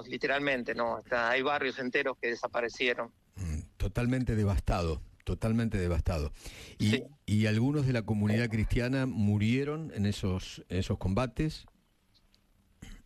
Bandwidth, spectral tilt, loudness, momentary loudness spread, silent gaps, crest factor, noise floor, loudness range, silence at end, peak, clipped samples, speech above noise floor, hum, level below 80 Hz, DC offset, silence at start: 13.5 kHz; -6.5 dB/octave; -31 LUFS; 9 LU; none; 18 dB; -68 dBFS; 3 LU; 0.05 s; -14 dBFS; under 0.1%; 37 dB; none; -44 dBFS; under 0.1%; 0 s